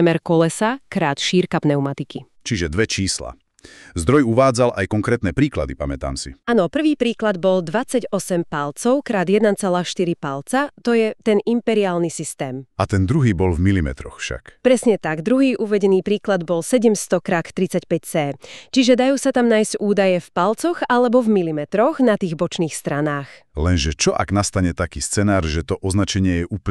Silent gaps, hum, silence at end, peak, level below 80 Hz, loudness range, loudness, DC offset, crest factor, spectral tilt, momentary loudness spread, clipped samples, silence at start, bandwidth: none; none; 0 s; -4 dBFS; -38 dBFS; 3 LU; -19 LUFS; under 0.1%; 16 dB; -5.5 dB/octave; 9 LU; under 0.1%; 0 s; 13.5 kHz